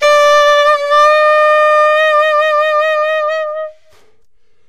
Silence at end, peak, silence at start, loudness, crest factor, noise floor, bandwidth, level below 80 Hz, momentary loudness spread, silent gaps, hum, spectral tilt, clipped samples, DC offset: 0.95 s; -2 dBFS; 0 s; -10 LUFS; 10 dB; -59 dBFS; 13 kHz; -54 dBFS; 9 LU; none; none; 1.5 dB/octave; under 0.1%; 0.7%